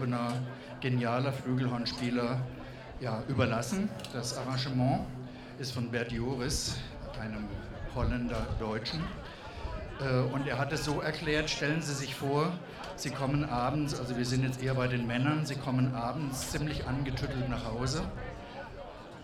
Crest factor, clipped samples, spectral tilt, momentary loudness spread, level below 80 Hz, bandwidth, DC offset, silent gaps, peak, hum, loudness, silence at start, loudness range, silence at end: 20 dB; under 0.1%; -5.5 dB/octave; 11 LU; -46 dBFS; 14.5 kHz; under 0.1%; none; -12 dBFS; none; -33 LUFS; 0 s; 4 LU; 0 s